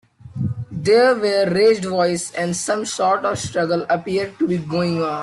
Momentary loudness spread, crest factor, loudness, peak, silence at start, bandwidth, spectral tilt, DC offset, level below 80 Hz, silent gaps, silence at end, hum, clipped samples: 9 LU; 14 dB; -19 LUFS; -4 dBFS; 0.25 s; 12.5 kHz; -5 dB/octave; under 0.1%; -54 dBFS; none; 0 s; none; under 0.1%